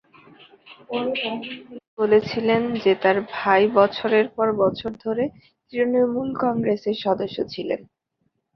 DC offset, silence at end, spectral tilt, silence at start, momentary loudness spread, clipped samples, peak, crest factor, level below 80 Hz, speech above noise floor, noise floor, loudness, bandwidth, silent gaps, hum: under 0.1%; 0.75 s; -7 dB/octave; 0.65 s; 11 LU; under 0.1%; -4 dBFS; 20 dB; -60 dBFS; 51 dB; -73 dBFS; -22 LUFS; 6.2 kHz; 1.88-1.97 s; none